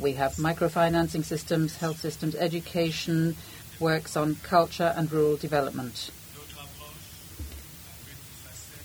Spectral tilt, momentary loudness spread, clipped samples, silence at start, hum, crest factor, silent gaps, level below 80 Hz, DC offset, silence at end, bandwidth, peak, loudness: -5.5 dB/octave; 19 LU; under 0.1%; 0 s; none; 20 dB; none; -52 dBFS; under 0.1%; 0 s; over 20 kHz; -8 dBFS; -27 LUFS